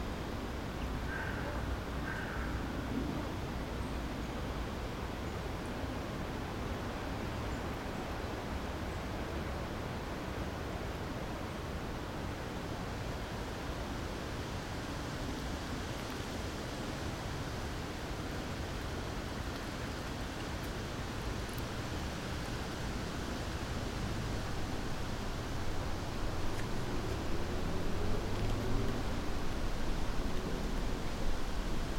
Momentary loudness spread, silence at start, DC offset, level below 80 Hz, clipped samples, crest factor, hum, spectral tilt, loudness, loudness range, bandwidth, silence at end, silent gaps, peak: 2 LU; 0 s; under 0.1%; -42 dBFS; under 0.1%; 16 dB; none; -5.5 dB/octave; -40 LUFS; 2 LU; 16 kHz; 0 s; none; -20 dBFS